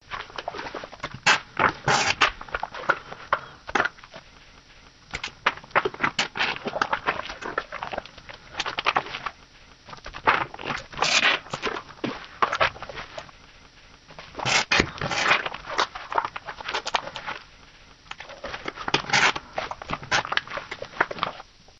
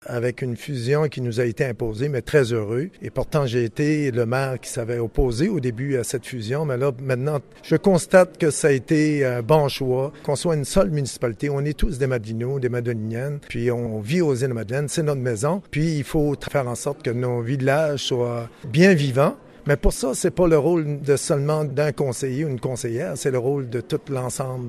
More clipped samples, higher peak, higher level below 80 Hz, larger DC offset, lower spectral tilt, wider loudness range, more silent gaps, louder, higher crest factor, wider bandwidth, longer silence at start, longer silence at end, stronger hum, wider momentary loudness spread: neither; about the same, -2 dBFS vs -2 dBFS; second, -52 dBFS vs -36 dBFS; neither; second, -2 dB/octave vs -6 dB/octave; about the same, 5 LU vs 4 LU; neither; second, -25 LUFS vs -22 LUFS; first, 26 dB vs 20 dB; second, 10.5 kHz vs 14 kHz; about the same, 0.05 s vs 0.05 s; first, 0.4 s vs 0 s; neither; first, 16 LU vs 8 LU